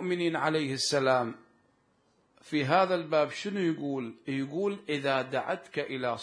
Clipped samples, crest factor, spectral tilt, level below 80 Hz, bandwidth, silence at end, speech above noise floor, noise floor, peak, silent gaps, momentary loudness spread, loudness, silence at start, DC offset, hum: under 0.1%; 20 dB; -4.5 dB/octave; -80 dBFS; 10.5 kHz; 0 s; 40 dB; -69 dBFS; -10 dBFS; none; 9 LU; -30 LUFS; 0 s; under 0.1%; none